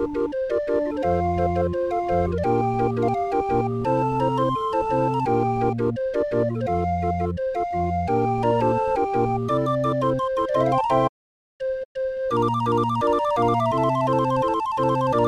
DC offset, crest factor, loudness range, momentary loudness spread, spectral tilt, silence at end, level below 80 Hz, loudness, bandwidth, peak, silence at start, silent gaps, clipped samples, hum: under 0.1%; 16 dB; 1 LU; 4 LU; -8 dB/octave; 0 s; -44 dBFS; -23 LUFS; 11.5 kHz; -6 dBFS; 0 s; 11.09-11.60 s, 11.85-11.95 s; under 0.1%; none